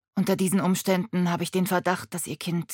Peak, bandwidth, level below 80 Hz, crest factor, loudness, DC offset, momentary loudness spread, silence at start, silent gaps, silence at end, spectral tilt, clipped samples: -8 dBFS; 17.5 kHz; -70 dBFS; 16 dB; -26 LUFS; under 0.1%; 6 LU; 0.15 s; none; 0 s; -5.5 dB/octave; under 0.1%